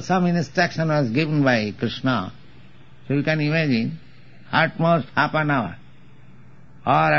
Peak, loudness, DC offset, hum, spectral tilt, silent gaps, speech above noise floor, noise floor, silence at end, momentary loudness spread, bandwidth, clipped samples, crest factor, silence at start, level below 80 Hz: -4 dBFS; -21 LUFS; 0.7%; none; -5 dB/octave; none; 28 dB; -49 dBFS; 0 s; 7 LU; 7.2 kHz; under 0.1%; 18 dB; 0 s; -56 dBFS